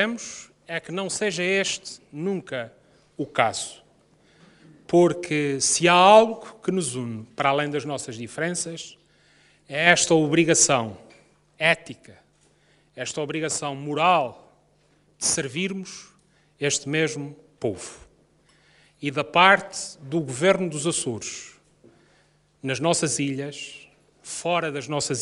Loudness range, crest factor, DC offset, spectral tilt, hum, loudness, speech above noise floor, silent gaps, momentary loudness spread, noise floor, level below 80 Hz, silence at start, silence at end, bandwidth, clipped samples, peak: 8 LU; 24 dB; under 0.1%; -3 dB/octave; none; -23 LUFS; 39 dB; none; 18 LU; -62 dBFS; -64 dBFS; 0 s; 0 s; 11.5 kHz; under 0.1%; 0 dBFS